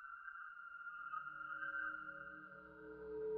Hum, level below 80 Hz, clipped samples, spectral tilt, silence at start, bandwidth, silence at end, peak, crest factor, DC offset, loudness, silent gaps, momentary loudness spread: none; -78 dBFS; under 0.1%; -2.5 dB/octave; 0 s; 4.7 kHz; 0 s; -34 dBFS; 14 dB; under 0.1%; -49 LUFS; none; 11 LU